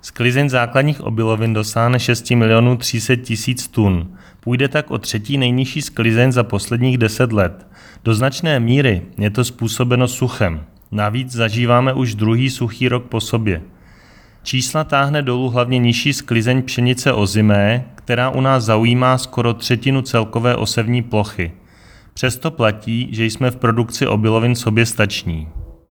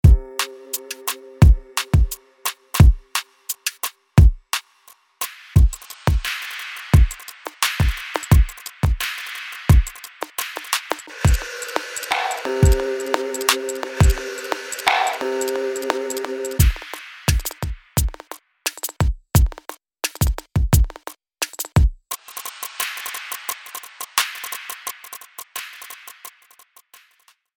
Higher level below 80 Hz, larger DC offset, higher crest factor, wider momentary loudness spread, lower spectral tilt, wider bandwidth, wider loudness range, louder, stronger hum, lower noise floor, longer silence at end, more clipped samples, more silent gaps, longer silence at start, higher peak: second, -42 dBFS vs -24 dBFS; neither; about the same, 16 dB vs 20 dB; second, 7 LU vs 14 LU; about the same, -5.5 dB/octave vs -4.5 dB/octave; about the same, 19 kHz vs 17.5 kHz; second, 3 LU vs 7 LU; first, -17 LUFS vs -22 LUFS; neither; second, -45 dBFS vs -59 dBFS; second, 0.15 s vs 1.25 s; neither; neither; about the same, 0.05 s vs 0.05 s; about the same, 0 dBFS vs 0 dBFS